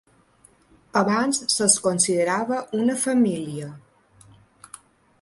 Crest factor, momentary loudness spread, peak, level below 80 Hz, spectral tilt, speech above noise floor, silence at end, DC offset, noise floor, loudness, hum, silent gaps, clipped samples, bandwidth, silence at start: 20 dB; 12 LU; -4 dBFS; -66 dBFS; -3 dB/octave; 36 dB; 1.45 s; under 0.1%; -57 dBFS; -21 LUFS; none; none; under 0.1%; 11.5 kHz; 0.95 s